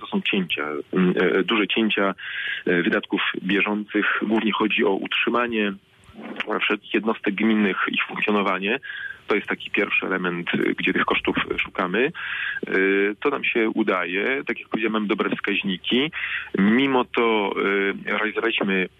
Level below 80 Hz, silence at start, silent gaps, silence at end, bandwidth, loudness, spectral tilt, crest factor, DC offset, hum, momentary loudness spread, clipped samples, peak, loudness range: -60 dBFS; 0 s; none; 0.1 s; 5.4 kHz; -22 LUFS; -7 dB/octave; 14 dB; under 0.1%; none; 6 LU; under 0.1%; -10 dBFS; 1 LU